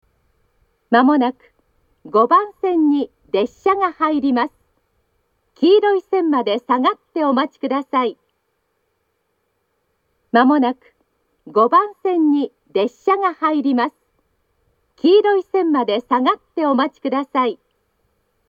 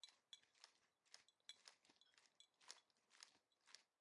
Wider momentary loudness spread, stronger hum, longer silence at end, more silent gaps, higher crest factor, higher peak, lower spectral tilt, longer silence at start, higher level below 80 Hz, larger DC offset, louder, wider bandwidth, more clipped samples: first, 8 LU vs 5 LU; neither; first, 0.95 s vs 0.15 s; neither; second, 18 dB vs 32 dB; first, 0 dBFS vs -38 dBFS; first, -6.5 dB/octave vs 2 dB/octave; first, 0.9 s vs 0 s; first, -66 dBFS vs under -90 dBFS; neither; first, -17 LUFS vs -66 LUFS; second, 7.2 kHz vs 11 kHz; neither